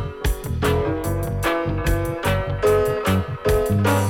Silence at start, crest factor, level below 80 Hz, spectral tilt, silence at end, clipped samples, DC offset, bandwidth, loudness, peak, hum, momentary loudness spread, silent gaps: 0 s; 12 dB; -30 dBFS; -6 dB/octave; 0 s; under 0.1%; under 0.1%; 17.5 kHz; -22 LUFS; -10 dBFS; none; 6 LU; none